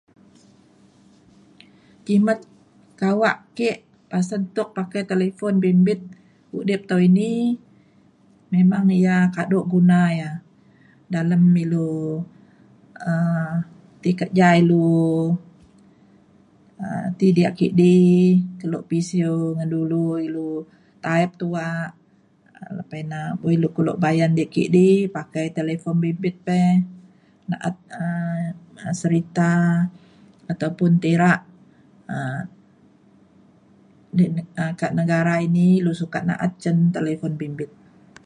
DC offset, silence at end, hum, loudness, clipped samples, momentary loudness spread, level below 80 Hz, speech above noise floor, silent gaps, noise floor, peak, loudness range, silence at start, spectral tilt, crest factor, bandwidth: under 0.1%; 0.6 s; none; -21 LUFS; under 0.1%; 14 LU; -62 dBFS; 37 dB; none; -57 dBFS; -4 dBFS; 6 LU; 2.05 s; -8 dB/octave; 18 dB; 9.8 kHz